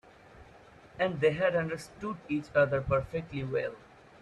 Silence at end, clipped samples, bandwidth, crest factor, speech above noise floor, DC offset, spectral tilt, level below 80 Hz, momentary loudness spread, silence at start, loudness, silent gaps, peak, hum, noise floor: 0.45 s; under 0.1%; 12 kHz; 18 dB; 25 dB; under 0.1%; -7 dB/octave; -56 dBFS; 12 LU; 0.35 s; -31 LUFS; none; -14 dBFS; none; -55 dBFS